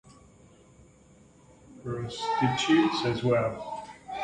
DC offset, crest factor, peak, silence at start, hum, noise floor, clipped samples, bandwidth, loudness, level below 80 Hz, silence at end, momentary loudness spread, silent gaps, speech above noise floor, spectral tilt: under 0.1%; 18 dB; -12 dBFS; 0.05 s; none; -57 dBFS; under 0.1%; 10 kHz; -27 LUFS; -58 dBFS; 0 s; 16 LU; none; 30 dB; -5.5 dB/octave